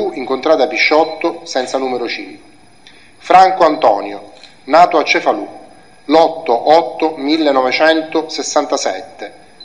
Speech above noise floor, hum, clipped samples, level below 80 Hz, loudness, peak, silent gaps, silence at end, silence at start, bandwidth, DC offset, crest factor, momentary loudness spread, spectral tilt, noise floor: 31 dB; none; 0.2%; -58 dBFS; -13 LUFS; 0 dBFS; none; 0 s; 0 s; 10.5 kHz; 0.5%; 14 dB; 16 LU; -3 dB/octave; -44 dBFS